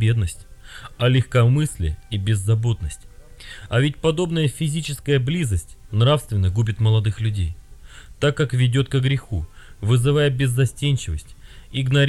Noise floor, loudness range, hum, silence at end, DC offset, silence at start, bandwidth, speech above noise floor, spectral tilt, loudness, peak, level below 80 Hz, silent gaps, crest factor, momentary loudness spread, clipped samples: -41 dBFS; 2 LU; none; 0 s; under 0.1%; 0 s; 13 kHz; 21 dB; -6 dB/octave; -21 LUFS; -6 dBFS; -38 dBFS; none; 14 dB; 12 LU; under 0.1%